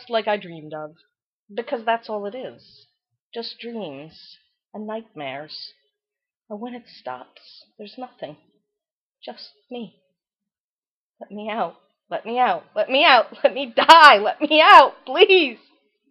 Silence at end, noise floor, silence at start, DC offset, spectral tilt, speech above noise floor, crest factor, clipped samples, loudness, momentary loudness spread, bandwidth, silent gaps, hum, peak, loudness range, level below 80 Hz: 0.55 s; under -90 dBFS; 0.1 s; under 0.1%; -3 dB/octave; over 71 dB; 20 dB; under 0.1%; -15 LUFS; 27 LU; 15 kHz; 1.23-1.46 s, 3.22-3.32 s, 6.36-6.40 s, 8.91-9.15 s, 10.58-11.13 s; none; 0 dBFS; 26 LU; -70 dBFS